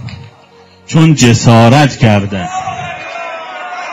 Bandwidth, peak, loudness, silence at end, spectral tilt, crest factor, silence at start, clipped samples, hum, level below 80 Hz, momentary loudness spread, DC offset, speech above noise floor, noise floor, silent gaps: 12 kHz; 0 dBFS; -9 LUFS; 0 s; -5.5 dB/octave; 10 dB; 0 s; 1%; none; -40 dBFS; 16 LU; under 0.1%; 34 dB; -41 dBFS; none